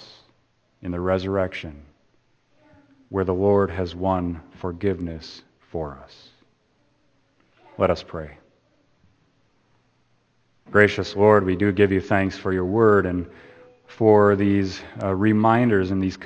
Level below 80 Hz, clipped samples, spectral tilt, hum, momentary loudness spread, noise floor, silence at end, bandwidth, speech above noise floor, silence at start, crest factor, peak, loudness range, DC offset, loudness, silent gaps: -52 dBFS; under 0.1%; -7.5 dB/octave; none; 18 LU; -65 dBFS; 0 s; 8.2 kHz; 44 dB; 0 s; 24 dB; 0 dBFS; 12 LU; under 0.1%; -21 LUFS; none